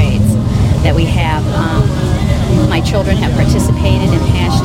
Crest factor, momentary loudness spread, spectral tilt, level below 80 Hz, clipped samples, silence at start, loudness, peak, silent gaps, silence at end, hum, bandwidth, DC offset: 12 dB; 2 LU; -6.5 dB/octave; -20 dBFS; under 0.1%; 0 s; -12 LUFS; 0 dBFS; none; 0 s; 60 Hz at -20 dBFS; 16 kHz; 0.3%